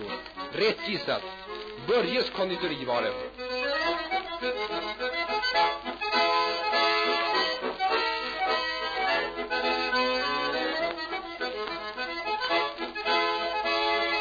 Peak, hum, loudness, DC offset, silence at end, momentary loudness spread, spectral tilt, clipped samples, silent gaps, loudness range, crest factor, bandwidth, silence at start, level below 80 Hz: -14 dBFS; none; -28 LUFS; under 0.1%; 0 s; 9 LU; -3.5 dB/octave; under 0.1%; none; 3 LU; 16 dB; 5 kHz; 0 s; -58 dBFS